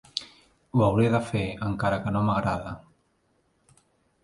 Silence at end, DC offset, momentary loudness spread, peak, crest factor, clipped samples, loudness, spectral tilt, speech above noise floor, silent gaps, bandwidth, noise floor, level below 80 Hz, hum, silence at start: 1.45 s; under 0.1%; 13 LU; -6 dBFS; 20 dB; under 0.1%; -26 LUFS; -7 dB/octave; 44 dB; none; 11.5 kHz; -69 dBFS; -50 dBFS; none; 0.15 s